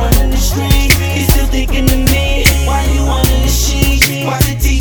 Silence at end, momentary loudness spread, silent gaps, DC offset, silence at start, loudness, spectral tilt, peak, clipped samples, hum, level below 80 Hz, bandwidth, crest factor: 0 s; 3 LU; none; under 0.1%; 0 s; -12 LUFS; -4 dB/octave; 0 dBFS; 0.2%; none; -14 dBFS; over 20 kHz; 10 dB